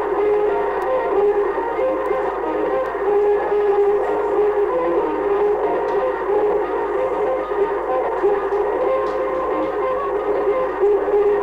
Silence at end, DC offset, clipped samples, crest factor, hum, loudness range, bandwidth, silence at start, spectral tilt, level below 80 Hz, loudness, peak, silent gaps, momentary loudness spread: 0 s; under 0.1%; under 0.1%; 12 dB; none; 2 LU; 5.2 kHz; 0 s; -7 dB/octave; -46 dBFS; -19 LUFS; -8 dBFS; none; 4 LU